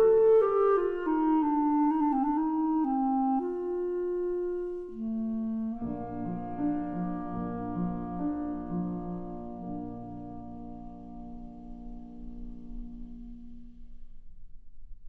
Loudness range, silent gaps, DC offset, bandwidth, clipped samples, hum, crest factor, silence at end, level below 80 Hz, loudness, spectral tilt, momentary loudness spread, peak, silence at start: 19 LU; none; under 0.1%; 3.3 kHz; under 0.1%; none; 14 dB; 0 s; -48 dBFS; -30 LUFS; -11 dB/octave; 20 LU; -16 dBFS; 0 s